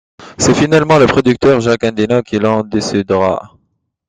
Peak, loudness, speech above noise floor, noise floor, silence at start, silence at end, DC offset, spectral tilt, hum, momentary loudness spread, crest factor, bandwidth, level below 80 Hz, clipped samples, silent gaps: 0 dBFS; -12 LUFS; 52 dB; -64 dBFS; 0.2 s; 0.6 s; under 0.1%; -5.5 dB/octave; none; 7 LU; 12 dB; 10 kHz; -42 dBFS; under 0.1%; none